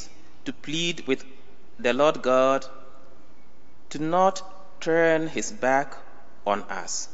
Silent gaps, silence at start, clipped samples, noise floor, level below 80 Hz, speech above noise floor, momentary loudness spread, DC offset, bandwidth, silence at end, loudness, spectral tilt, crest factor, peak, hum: none; 0 s; under 0.1%; -56 dBFS; -62 dBFS; 32 dB; 17 LU; 3%; 8 kHz; 0.1 s; -25 LUFS; -3 dB/octave; 20 dB; -8 dBFS; none